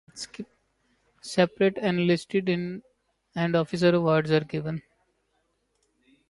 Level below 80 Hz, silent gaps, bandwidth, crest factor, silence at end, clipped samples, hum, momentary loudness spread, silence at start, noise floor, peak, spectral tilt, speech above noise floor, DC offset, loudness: -64 dBFS; none; 11.5 kHz; 20 dB; 1.5 s; under 0.1%; none; 16 LU; 0.15 s; -73 dBFS; -8 dBFS; -6.5 dB/octave; 48 dB; under 0.1%; -25 LUFS